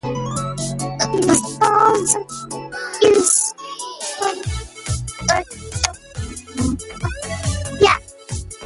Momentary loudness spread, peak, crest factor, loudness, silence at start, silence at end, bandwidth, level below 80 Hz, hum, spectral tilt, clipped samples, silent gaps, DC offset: 15 LU; 0 dBFS; 20 dB; -19 LUFS; 0.05 s; 0 s; 12 kHz; -36 dBFS; none; -3.5 dB/octave; under 0.1%; none; under 0.1%